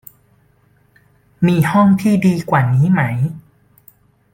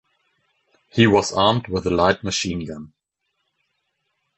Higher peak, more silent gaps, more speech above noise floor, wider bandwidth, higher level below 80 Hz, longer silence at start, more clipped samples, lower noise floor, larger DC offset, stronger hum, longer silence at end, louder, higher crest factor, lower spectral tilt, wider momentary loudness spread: about the same, -2 dBFS vs -2 dBFS; neither; second, 42 dB vs 56 dB; first, 17 kHz vs 8.4 kHz; second, -52 dBFS vs -46 dBFS; first, 1.4 s vs 0.95 s; neither; second, -55 dBFS vs -75 dBFS; neither; neither; second, 0.95 s vs 1.5 s; first, -15 LUFS vs -19 LUFS; second, 14 dB vs 20 dB; first, -8 dB/octave vs -4.5 dB/octave; second, 8 LU vs 14 LU